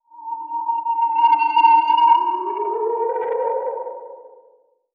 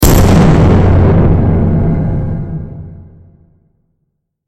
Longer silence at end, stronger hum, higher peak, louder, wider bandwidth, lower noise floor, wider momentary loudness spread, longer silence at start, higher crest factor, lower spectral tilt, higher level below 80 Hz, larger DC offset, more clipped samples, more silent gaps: second, 0.65 s vs 1.45 s; neither; second, -4 dBFS vs 0 dBFS; second, -18 LUFS vs -10 LUFS; second, 5 kHz vs 16.5 kHz; second, -56 dBFS vs -67 dBFS; about the same, 16 LU vs 16 LU; first, 0.15 s vs 0 s; first, 16 dB vs 10 dB; second, -3 dB/octave vs -7 dB/octave; second, under -90 dBFS vs -18 dBFS; neither; neither; neither